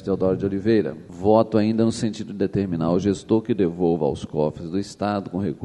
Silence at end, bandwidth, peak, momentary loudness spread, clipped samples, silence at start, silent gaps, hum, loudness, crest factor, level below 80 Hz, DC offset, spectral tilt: 0 s; 11 kHz; -2 dBFS; 8 LU; under 0.1%; 0 s; none; none; -22 LUFS; 18 dB; -50 dBFS; under 0.1%; -7.5 dB/octave